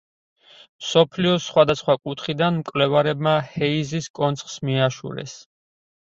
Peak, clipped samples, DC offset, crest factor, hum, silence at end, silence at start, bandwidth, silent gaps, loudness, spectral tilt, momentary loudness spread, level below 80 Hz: -2 dBFS; under 0.1%; under 0.1%; 20 dB; none; 0.7 s; 0.8 s; 7.8 kHz; 4.10-4.14 s; -21 LUFS; -5.5 dB/octave; 11 LU; -58 dBFS